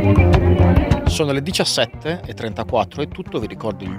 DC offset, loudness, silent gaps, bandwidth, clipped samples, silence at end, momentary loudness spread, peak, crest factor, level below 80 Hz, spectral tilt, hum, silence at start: under 0.1%; -19 LUFS; none; 15 kHz; under 0.1%; 0 s; 12 LU; 0 dBFS; 16 dB; -26 dBFS; -6 dB/octave; none; 0 s